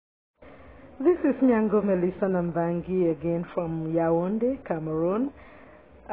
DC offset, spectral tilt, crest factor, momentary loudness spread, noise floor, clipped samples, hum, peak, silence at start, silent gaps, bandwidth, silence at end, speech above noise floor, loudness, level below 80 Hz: 0.1%; -9 dB/octave; 16 dB; 7 LU; -51 dBFS; under 0.1%; none; -10 dBFS; 0.4 s; none; 3.8 kHz; 0 s; 26 dB; -26 LUFS; -56 dBFS